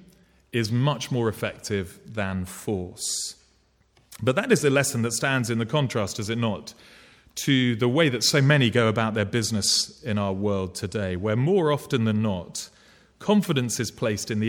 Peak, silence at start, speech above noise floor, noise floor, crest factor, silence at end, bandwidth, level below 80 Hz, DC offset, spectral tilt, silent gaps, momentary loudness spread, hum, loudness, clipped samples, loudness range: -6 dBFS; 0.55 s; 39 dB; -63 dBFS; 18 dB; 0 s; 18 kHz; -58 dBFS; under 0.1%; -4.5 dB/octave; none; 11 LU; none; -24 LUFS; under 0.1%; 6 LU